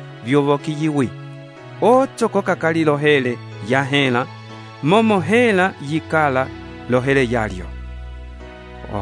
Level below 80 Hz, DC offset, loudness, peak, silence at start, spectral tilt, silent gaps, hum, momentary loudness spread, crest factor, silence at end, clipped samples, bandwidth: -40 dBFS; under 0.1%; -18 LUFS; -2 dBFS; 0 s; -6 dB/octave; none; none; 21 LU; 16 dB; 0 s; under 0.1%; 11 kHz